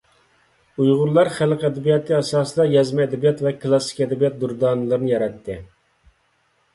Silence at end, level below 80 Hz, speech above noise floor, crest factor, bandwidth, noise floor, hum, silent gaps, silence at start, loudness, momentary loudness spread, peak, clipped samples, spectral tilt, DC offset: 1.1 s; -56 dBFS; 45 dB; 18 dB; 11.5 kHz; -64 dBFS; none; none; 0.8 s; -19 LUFS; 6 LU; -4 dBFS; under 0.1%; -6.5 dB/octave; under 0.1%